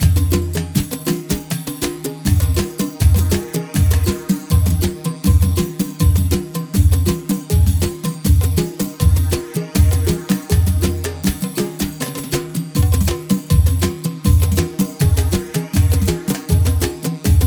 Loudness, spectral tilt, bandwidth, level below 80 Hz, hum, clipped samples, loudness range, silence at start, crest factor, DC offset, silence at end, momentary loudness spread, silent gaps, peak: -18 LUFS; -6 dB/octave; over 20 kHz; -22 dBFS; none; under 0.1%; 2 LU; 0 s; 14 dB; under 0.1%; 0 s; 7 LU; none; -2 dBFS